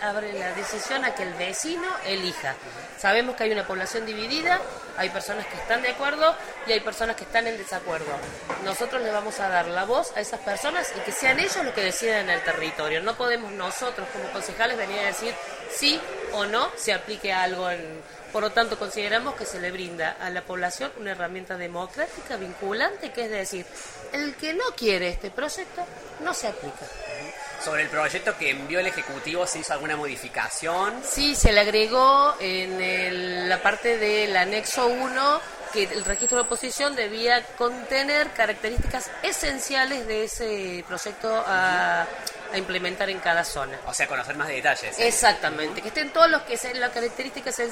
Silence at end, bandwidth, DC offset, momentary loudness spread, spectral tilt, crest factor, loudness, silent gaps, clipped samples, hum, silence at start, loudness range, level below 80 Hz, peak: 0 s; 16 kHz; under 0.1%; 11 LU; -2 dB/octave; 24 dB; -25 LUFS; none; under 0.1%; none; 0 s; 7 LU; -42 dBFS; -2 dBFS